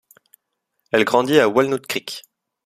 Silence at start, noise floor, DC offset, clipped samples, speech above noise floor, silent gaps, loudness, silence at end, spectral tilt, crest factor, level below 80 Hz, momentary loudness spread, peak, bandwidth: 0.95 s; -76 dBFS; under 0.1%; under 0.1%; 58 dB; none; -18 LUFS; 0.45 s; -4.5 dB/octave; 20 dB; -62 dBFS; 14 LU; 0 dBFS; 15.5 kHz